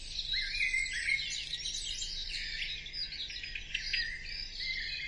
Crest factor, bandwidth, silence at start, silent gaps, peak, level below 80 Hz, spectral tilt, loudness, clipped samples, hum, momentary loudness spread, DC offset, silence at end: 18 dB; 11.5 kHz; 0 s; none; -20 dBFS; -48 dBFS; 1 dB/octave; -34 LUFS; under 0.1%; none; 7 LU; under 0.1%; 0 s